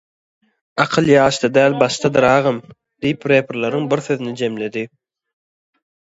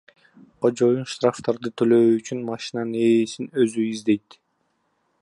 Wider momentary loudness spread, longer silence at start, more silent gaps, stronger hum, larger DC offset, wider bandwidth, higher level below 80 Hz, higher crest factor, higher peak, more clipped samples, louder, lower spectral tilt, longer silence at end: about the same, 12 LU vs 10 LU; first, 0.75 s vs 0.6 s; neither; neither; neither; second, 8 kHz vs 11 kHz; first, -54 dBFS vs -70 dBFS; about the same, 18 dB vs 16 dB; first, 0 dBFS vs -6 dBFS; neither; first, -17 LUFS vs -22 LUFS; about the same, -5.5 dB/octave vs -6 dB/octave; about the same, 1.15 s vs 1.05 s